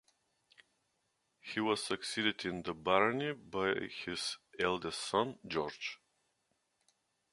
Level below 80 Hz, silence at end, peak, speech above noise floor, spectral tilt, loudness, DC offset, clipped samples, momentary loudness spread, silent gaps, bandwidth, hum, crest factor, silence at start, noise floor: -70 dBFS; 1.4 s; -12 dBFS; 45 dB; -3.5 dB/octave; -36 LUFS; under 0.1%; under 0.1%; 10 LU; none; 11.5 kHz; none; 26 dB; 1.45 s; -81 dBFS